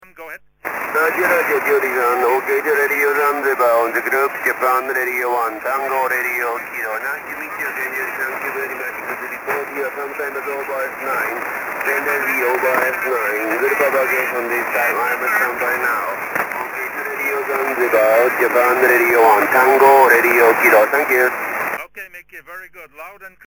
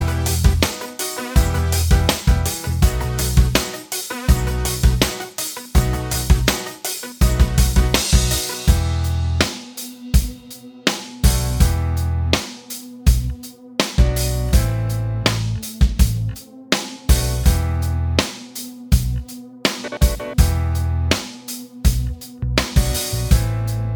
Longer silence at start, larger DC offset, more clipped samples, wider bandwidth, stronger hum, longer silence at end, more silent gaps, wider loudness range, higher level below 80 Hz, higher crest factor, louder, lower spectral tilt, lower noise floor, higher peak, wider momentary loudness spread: first, 0.15 s vs 0 s; neither; neither; second, 17.5 kHz vs over 20 kHz; neither; first, 0.2 s vs 0 s; neither; first, 11 LU vs 3 LU; second, -62 dBFS vs -20 dBFS; about the same, 18 dB vs 18 dB; first, -16 LUFS vs -20 LUFS; about the same, -3.5 dB/octave vs -4.5 dB/octave; about the same, -37 dBFS vs -39 dBFS; about the same, 0 dBFS vs 0 dBFS; first, 13 LU vs 9 LU